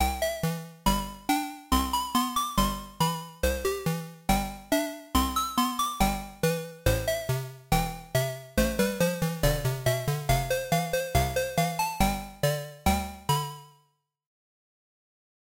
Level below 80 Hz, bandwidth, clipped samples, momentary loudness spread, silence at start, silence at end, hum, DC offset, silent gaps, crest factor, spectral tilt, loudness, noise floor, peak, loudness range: -38 dBFS; 17 kHz; under 0.1%; 3 LU; 0 s; 1.85 s; none; under 0.1%; none; 18 dB; -4.5 dB/octave; -28 LUFS; -70 dBFS; -10 dBFS; 2 LU